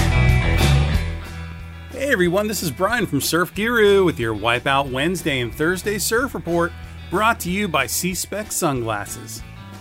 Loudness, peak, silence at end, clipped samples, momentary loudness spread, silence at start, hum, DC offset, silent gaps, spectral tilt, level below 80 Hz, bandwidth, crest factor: -20 LUFS; -4 dBFS; 0 s; under 0.1%; 14 LU; 0 s; none; under 0.1%; none; -4.5 dB/octave; -30 dBFS; 16 kHz; 16 dB